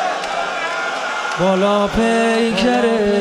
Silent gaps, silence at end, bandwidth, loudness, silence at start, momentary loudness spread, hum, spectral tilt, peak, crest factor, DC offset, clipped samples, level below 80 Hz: none; 0 s; 13 kHz; -17 LUFS; 0 s; 6 LU; none; -4.5 dB/octave; -4 dBFS; 12 dB; under 0.1%; under 0.1%; -40 dBFS